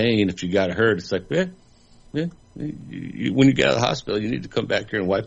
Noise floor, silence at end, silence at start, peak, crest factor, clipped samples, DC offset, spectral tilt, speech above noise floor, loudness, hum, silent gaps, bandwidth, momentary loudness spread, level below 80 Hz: -51 dBFS; 0 s; 0 s; -4 dBFS; 18 dB; under 0.1%; under 0.1%; -6 dB/octave; 29 dB; -22 LUFS; none; none; 8 kHz; 15 LU; -50 dBFS